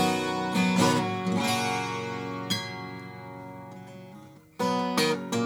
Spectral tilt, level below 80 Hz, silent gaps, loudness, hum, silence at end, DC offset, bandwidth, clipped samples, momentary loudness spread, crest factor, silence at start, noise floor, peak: -4.5 dB/octave; -70 dBFS; none; -27 LUFS; none; 0 s; under 0.1%; 18 kHz; under 0.1%; 20 LU; 20 dB; 0 s; -49 dBFS; -8 dBFS